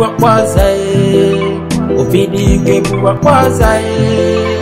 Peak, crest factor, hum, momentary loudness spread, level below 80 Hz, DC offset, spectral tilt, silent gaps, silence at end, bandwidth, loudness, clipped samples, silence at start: 0 dBFS; 10 dB; none; 4 LU; -22 dBFS; under 0.1%; -6.5 dB/octave; none; 0 s; 16.5 kHz; -11 LUFS; 0.3%; 0 s